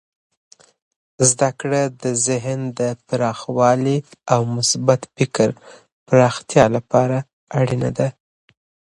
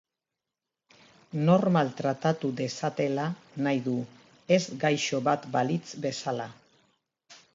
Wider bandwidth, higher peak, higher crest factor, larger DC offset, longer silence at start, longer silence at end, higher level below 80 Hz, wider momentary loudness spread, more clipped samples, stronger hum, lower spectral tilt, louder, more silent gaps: first, 11.5 kHz vs 7.8 kHz; first, 0 dBFS vs -10 dBFS; about the same, 20 dB vs 20 dB; neither; second, 1.2 s vs 1.35 s; first, 0.8 s vs 0.2 s; first, -52 dBFS vs -74 dBFS; about the same, 8 LU vs 10 LU; neither; neither; about the same, -5 dB/octave vs -6 dB/octave; first, -19 LUFS vs -28 LUFS; first, 5.92-6.06 s, 7.33-7.47 s vs none